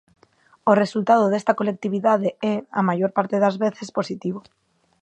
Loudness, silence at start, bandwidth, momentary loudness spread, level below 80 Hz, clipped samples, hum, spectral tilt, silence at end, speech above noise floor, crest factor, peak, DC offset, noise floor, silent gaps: -21 LUFS; 0.65 s; 8.8 kHz; 10 LU; -72 dBFS; under 0.1%; none; -7 dB/octave; 0.65 s; 37 dB; 20 dB; -2 dBFS; under 0.1%; -58 dBFS; none